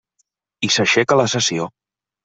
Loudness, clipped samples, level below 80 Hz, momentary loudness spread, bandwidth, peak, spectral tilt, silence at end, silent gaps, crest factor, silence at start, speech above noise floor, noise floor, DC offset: -17 LUFS; under 0.1%; -60 dBFS; 11 LU; 8.4 kHz; -2 dBFS; -3 dB/octave; 0.55 s; none; 18 dB; 0.6 s; 52 dB; -69 dBFS; under 0.1%